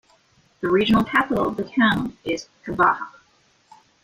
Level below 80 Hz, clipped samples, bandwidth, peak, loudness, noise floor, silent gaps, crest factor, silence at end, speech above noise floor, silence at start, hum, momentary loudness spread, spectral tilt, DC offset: -50 dBFS; under 0.1%; 15.5 kHz; -4 dBFS; -21 LUFS; -60 dBFS; none; 18 dB; 0.95 s; 39 dB; 0.6 s; none; 11 LU; -6 dB/octave; under 0.1%